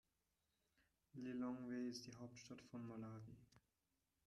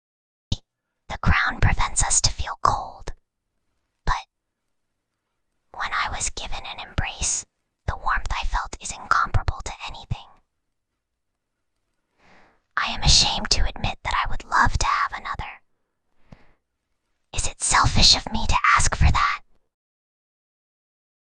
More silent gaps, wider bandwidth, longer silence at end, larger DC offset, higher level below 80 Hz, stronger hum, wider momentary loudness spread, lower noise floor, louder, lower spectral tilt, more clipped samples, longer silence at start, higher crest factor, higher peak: neither; first, 12.5 kHz vs 10 kHz; second, 0.7 s vs 1.85 s; neither; second, -84 dBFS vs -30 dBFS; neither; second, 13 LU vs 17 LU; first, -90 dBFS vs -79 dBFS; second, -52 LUFS vs -22 LUFS; first, -5.5 dB/octave vs -2 dB/octave; neither; first, 1.15 s vs 0.5 s; second, 16 dB vs 22 dB; second, -38 dBFS vs -2 dBFS